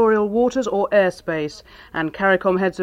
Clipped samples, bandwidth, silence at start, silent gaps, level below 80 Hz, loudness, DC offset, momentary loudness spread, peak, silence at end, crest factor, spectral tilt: under 0.1%; 12 kHz; 0 s; none; -52 dBFS; -20 LUFS; under 0.1%; 11 LU; -4 dBFS; 0 s; 16 dB; -6 dB/octave